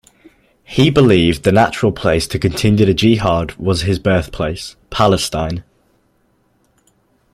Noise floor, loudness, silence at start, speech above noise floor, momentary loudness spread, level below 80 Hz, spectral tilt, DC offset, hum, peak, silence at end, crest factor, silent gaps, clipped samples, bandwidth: -59 dBFS; -15 LUFS; 0.7 s; 45 dB; 11 LU; -36 dBFS; -6 dB/octave; under 0.1%; none; 0 dBFS; 1.7 s; 16 dB; none; under 0.1%; 15.5 kHz